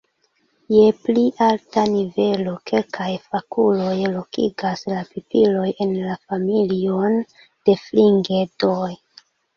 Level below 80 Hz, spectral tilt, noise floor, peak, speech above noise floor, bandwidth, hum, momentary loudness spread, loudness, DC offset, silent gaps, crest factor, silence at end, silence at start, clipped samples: -60 dBFS; -7.5 dB/octave; -65 dBFS; -2 dBFS; 46 dB; 7 kHz; none; 10 LU; -20 LUFS; under 0.1%; none; 18 dB; 0.6 s; 0.7 s; under 0.1%